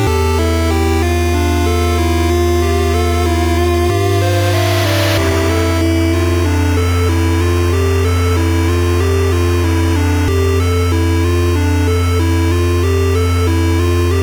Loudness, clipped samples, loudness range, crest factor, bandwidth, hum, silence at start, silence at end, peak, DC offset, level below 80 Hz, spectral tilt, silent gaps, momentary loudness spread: -14 LUFS; under 0.1%; 0 LU; 10 dB; 19.5 kHz; none; 0 s; 0 s; -4 dBFS; under 0.1%; -22 dBFS; -6 dB/octave; none; 1 LU